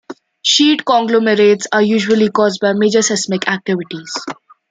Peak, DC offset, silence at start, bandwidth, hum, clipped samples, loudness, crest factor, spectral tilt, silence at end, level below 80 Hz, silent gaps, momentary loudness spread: 0 dBFS; under 0.1%; 0.1 s; 9.6 kHz; none; under 0.1%; -14 LUFS; 14 dB; -3.5 dB/octave; 0.4 s; -62 dBFS; none; 13 LU